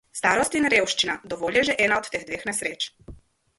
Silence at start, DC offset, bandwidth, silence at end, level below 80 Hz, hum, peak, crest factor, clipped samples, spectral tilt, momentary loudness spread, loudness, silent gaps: 0.15 s; under 0.1%; 12 kHz; 0.45 s; -54 dBFS; none; -6 dBFS; 18 dB; under 0.1%; -2 dB/octave; 10 LU; -23 LUFS; none